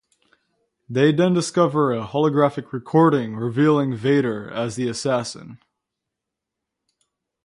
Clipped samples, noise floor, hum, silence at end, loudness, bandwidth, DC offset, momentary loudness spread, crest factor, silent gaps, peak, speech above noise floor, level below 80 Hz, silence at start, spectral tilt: under 0.1%; -83 dBFS; none; 1.9 s; -20 LUFS; 11.5 kHz; under 0.1%; 10 LU; 18 dB; none; -4 dBFS; 64 dB; -62 dBFS; 0.9 s; -6.5 dB/octave